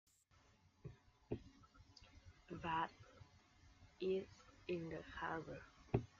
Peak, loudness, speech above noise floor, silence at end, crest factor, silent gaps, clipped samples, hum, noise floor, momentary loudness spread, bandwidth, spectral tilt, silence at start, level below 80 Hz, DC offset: -22 dBFS; -47 LUFS; 27 dB; 0.1 s; 26 dB; none; under 0.1%; none; -73 dBFS; 23 LU; 7.4 kHz; -5.5 dB/octave; 0.85 s; -68 dBFS; under 0.1%